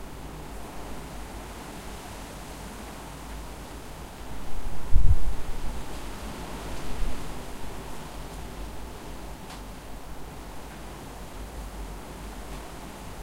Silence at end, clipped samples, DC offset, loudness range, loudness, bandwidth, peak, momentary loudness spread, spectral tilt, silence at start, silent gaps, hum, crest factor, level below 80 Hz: 0 s; under 0.1%; under 0.1%; 7 LU; -38 LUFS; 15.5 kHz; -4 dBFS; 5 LU; -5 dB/octave; 0 s; none; none; 22 dB; -34 dBFS